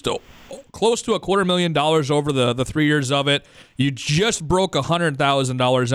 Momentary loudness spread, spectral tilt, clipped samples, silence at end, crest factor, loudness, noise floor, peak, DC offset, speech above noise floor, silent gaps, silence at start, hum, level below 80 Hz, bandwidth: 7 LU; -4.5 dB/octave; under 0.1%; 0 s; 14 dB; -20 LUFS; -40 dBFS; -6 dBFS; under 0.1%; 21 dB; none; 0.05 s; none; -46 dBFS; 14 kHz